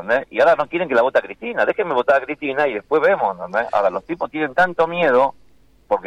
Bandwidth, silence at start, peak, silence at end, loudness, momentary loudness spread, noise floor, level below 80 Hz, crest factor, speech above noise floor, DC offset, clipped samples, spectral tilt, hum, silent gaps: 9.4 kHz; 0 s; -6 dBFS; 0 s; -19 LUFS; 7 LU; -52 dBFS; -56 dBFS; 14 dB; 34 dB; under 0.1%; under 0.1%; -6 dB/octave; none; none